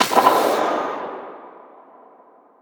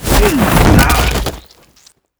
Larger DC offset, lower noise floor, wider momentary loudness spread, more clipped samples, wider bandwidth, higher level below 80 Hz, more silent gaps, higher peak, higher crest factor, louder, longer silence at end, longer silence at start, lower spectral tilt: neither; about the same, -51 dBFS vs -49 dBFS; first, 22 LU vs 10 LU; second, under 0.1% vs 0.2%; about the same, over 20 kHz vs over 20 kHz; second, -66 dBFS vs -18 dBFS; neither; about the same, -2 dBFS vs 0 dBFS; first, 20 dB vs 12 dB; second, -19 LUFS vs -11 LUFS; first, 1.1 s vs 0.8 s; about the same, 0 s vs 0 s; second, -2.5 dB/octave vs -5 dB/octave